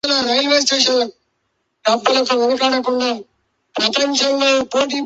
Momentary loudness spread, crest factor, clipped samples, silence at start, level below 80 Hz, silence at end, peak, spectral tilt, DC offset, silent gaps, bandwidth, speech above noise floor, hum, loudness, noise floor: 8 LU; 16 dB; under 0.1%; 0.05 s; -62 dBFS; 0 s; -2 dBFS; -1 dB/octave; under 0.1%; none; 8.2 kHz; 53 dB; none; -16 LUFS; -70 dBFS